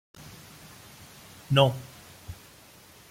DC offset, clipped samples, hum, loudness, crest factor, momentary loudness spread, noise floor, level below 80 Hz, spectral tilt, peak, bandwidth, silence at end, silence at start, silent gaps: under 0.1%; under 0.1%; none; -25 LUFS; 24 dB; 28 LU; -53 dBFS; -58 dBFS; -5.5 dB/octave; -6 dBFS; 16.5 kHz; 0.75 s; 0.2 s; none